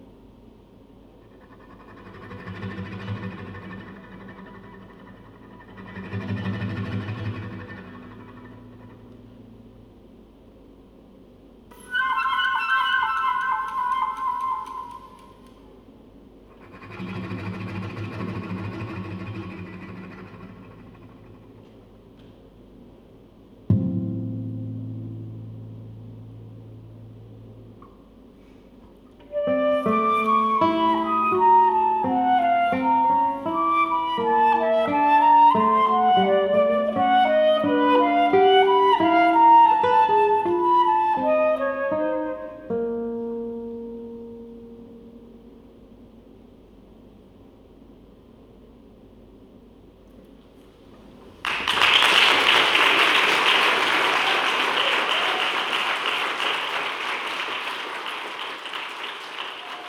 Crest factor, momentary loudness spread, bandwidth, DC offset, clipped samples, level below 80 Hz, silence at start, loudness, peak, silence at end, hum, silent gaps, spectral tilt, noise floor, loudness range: 22 dB; 24 LU; 17 kHz; under 0.1%; under 0.1%; -58 dBFS; 1.5 s; -21 LUFS; -2 dBFS; 0 s; none; none; -4.5 dB/octave; -50 dBFS; 21 LU